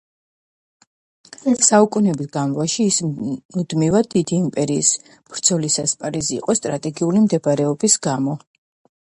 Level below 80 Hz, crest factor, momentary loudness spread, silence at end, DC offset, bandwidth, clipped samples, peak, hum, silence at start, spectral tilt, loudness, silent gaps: -56 dBFS; 20 dB; 10 LU; 0.7 s; under 0.1%; 11.5 kHz; under 0.1%; 0 dBFS; none; 1.45 s; -4.5 dB/octave; -18 LUFS; 3.45-3.49 s